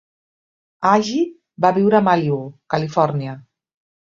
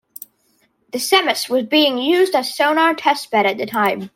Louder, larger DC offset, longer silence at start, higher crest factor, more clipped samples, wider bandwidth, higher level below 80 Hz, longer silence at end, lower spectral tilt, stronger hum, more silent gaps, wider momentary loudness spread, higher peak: about the same, -18 LUFS vs -16 LUFS; neither; second, 0.8 s vs 0.95 s; about the same, 18 dB vs 18 dB; neither; second, 7.6 kHz vs 16.5 kHz; first, -62 dBFS vs -68 dBFS; first, 0.75 s vs 0.1 s; first, -6.5 dB/octave vs -2.5 dB/octave; neither; neither; first, 11 LU vs 8 LU; about the same, -2 dBFS vs 0 dBFS